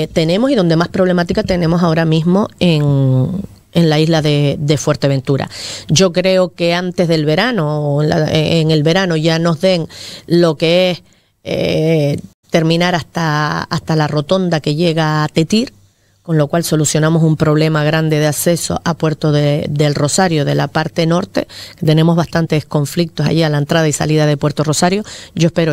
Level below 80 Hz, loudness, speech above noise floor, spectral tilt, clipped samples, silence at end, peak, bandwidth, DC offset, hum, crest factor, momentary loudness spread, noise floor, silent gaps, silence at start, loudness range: -44 dBFS; -14 LUFS; 35 dB; -5.5 dB/octave; under 0.1%; 0 s; 0 dBFS; 15.5 kHz; under 0.1%; none; 14 dB; 6 LU; -48 dBFS; 12.34-12.43 s; 0 s; 2 LU